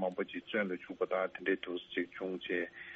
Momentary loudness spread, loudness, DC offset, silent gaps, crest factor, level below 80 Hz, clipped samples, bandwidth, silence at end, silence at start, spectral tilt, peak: 5 LU; -37 LUFS; under 0.1%; none; 18 dB; -76 dBFS; under 0.1%; 7.2 kHz; 0 s; 0 s; -3 dB/octave; -20 dBFS